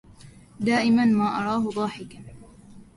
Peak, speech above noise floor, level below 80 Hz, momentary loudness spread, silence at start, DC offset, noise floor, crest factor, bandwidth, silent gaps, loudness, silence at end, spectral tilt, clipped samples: -10 dBFS; 25 dB; -56 dBFS; 21 LU; 0.2 s; under 0.1%; -48 dBFS; 14 dB; 11.5 kHz; none; -23 LUFS; 0.15 s; -6 dB/octave; under 0.1%